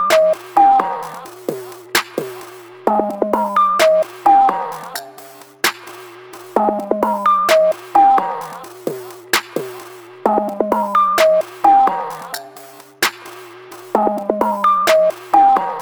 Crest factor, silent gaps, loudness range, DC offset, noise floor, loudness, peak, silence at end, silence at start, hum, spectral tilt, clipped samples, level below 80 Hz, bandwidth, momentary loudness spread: 16 dB; none; 2 LU; under 0.1%; -39 dBFS; -15 LUFS; 0 dBFS; 0 s; 0 s; none; -3 dB/octave; under 0.1%; -58 dBFS; over 20 kHz; 21 LU